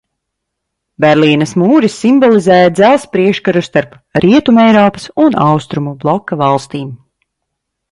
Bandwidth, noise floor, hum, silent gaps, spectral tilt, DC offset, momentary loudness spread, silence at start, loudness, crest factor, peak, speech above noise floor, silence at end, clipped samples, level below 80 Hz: 11.5 kHz; -74 dBFS; none; none; -6.5 dB/octave; under 0.1%; 9 LU; 1 s; -10 LUFS; 10 dB; 0 dBFS; 64 dB; 0.95 s; under 0.1%; -48 dBFS